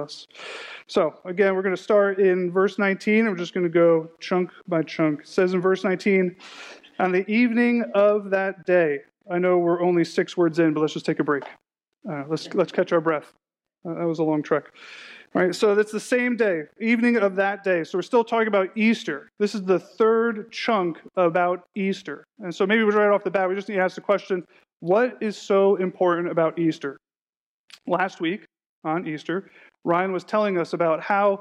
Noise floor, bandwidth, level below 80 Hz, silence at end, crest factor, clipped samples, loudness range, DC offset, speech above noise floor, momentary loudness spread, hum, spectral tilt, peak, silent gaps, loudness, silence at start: under -90 dBFS; 11 kHz; -76 dBFS; 0 s; 14 dB; under 0.1%; 5 LU; under 0.1%; over 68 dB; 13 LU; none; -6.5 dB/octave; -8 dBFS; 27.21-27.68 s, 28.66-28.82 s; -23 LUFS; 0 s